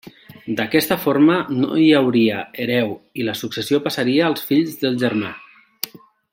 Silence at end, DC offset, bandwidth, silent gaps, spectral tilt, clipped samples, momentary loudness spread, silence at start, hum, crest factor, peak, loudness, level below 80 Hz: 0.45 s; under 0.1%; 16.5 kHz; none; -5.5 dB/octave; under 0.1%; 15 LU; 0.05 s; none; 18 dB; -2 dBFS; -18 LUFS; -62 dBFS